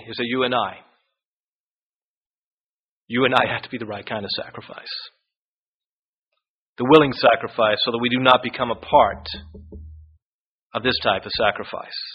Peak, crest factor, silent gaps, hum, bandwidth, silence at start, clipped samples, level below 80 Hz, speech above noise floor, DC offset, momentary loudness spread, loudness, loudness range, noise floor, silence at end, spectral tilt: 0 dBFS; 22 dB; 1.25-3.06 s, 5.37-5.80 s, 5.86-6.27 s, 6.49-6.76 s, 10.22-10.70 s; none; 5.4 kHz; 0 s; under 0.1%; -50 dBFS; over 69 dB; under 0.1%; 16 LU; -20 LUFS; 9 LU; under -90 dBFS; 0 s; -2.5 dB/octave